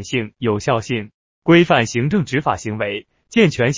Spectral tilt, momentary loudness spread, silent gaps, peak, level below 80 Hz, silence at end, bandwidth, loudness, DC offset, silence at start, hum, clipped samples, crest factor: -5.5 dB/octave; 12 LU; 1.14-1.42 s; 0 dBFS; -48 dBFS; 0 s; 7.6 kHz; -18 LUFS; under 0.1%; 0 s; none; under 0.1%; 16 dB